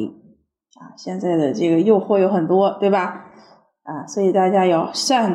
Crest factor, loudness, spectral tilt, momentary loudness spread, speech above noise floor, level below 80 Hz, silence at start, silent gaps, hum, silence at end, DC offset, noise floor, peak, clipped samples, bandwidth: 16 dB; -18 LUFS; -5.5 dB/octave; 15 LU; 38 dB; -74 dBFS; 0 s; none; none; 0 s; under 0.1%; -56 dBFS; -4 dBFS; under 0.1%; 12.5 kHz